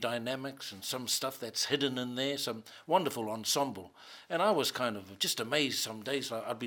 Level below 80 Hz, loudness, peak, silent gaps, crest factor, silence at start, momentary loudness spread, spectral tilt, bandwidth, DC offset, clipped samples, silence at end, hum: -82 dBFS; -33 LUFS; -14 dBFS; none; 20 dB; 0 s; 8 LU; -2.5 dB/octave; 17.5 kHz; under 0.1%; under 0.1%; 0 s; none